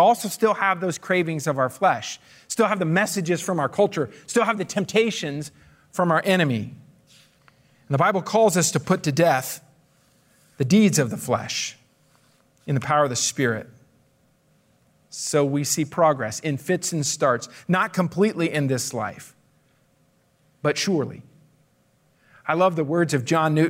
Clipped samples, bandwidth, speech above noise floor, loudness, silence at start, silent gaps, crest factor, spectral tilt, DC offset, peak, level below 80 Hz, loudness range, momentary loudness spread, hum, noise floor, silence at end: under 0.1%; 16 kHz; 41 dB; -22 LUFS; 0 s; none; 18 dB; -4.5 dB/octave; under 0.1%; -6 dBFS; -68 dBFS; 4 LU; 11 LU; none; -63 dBFS; 0 s